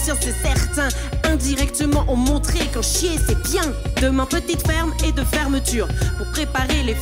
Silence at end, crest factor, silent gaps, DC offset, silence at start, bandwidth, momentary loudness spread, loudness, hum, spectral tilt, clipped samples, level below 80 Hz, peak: 0 s; 14 dB; none; under 0.1%; 0 s; 16 kHz; 3 LU; -20 LUFS; none; -4 dB/octave; under 0.1%; -24 dBFS; -6 dBFS